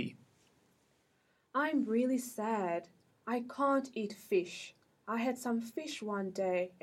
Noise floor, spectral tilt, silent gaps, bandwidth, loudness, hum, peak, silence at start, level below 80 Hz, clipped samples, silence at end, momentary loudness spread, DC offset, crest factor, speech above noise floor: -74 dBFS; -5 dB/octave; none; 16.5 kHz; -36 LUFS; none; -20 dBFS; 0 s; -84 dBFS; under 0.1%; 0.15 s; 11 LU; under 0.1%; 16 dB; 39 dB